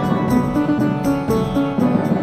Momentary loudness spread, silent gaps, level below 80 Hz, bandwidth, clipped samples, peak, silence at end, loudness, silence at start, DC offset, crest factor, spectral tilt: 2 LU; none; -40 dBFS; 15 kHz; under 0.1%; -6 dBFS; 0 s; -18 LUFS; 0 s; 0.2%; 12 dB; -8 dB/octave